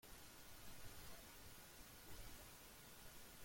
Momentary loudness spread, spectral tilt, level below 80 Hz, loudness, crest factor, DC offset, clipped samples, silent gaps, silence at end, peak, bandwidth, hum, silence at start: 2 LU; -2.5 dB/octave; -66 dBFS; -59 LUFS; 16 dB; under 0.1%; under 0.1%; none; 0 s; -42 dBFS; 16.5 kHz; none; 0 s